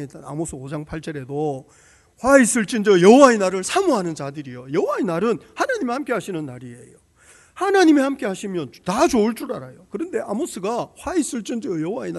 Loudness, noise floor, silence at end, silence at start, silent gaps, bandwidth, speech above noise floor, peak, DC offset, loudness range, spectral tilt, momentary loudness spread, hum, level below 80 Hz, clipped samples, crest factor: -20 LUFS; -52 dBFS; 0 s; 0 s; none; 12 kHz; 32 dB; 0 dBFS; under 0.1%; 7 LU; -4.5 dB/octave; 17 LU; none; -52 dBFS; under 0.1%; 20 dB